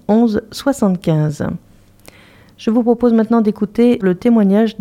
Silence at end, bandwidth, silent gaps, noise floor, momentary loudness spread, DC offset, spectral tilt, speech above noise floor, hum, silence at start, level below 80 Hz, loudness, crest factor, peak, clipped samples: 0.1 s; 14.5 kHz; none; -45 dBFS; 8 LU; under 0.1%; -7.5 dB/octave; 31 dB; none; 0.1 s; -48 dBFS; -15 LUFS; 14 dB; 0 dBFS; under 0.1%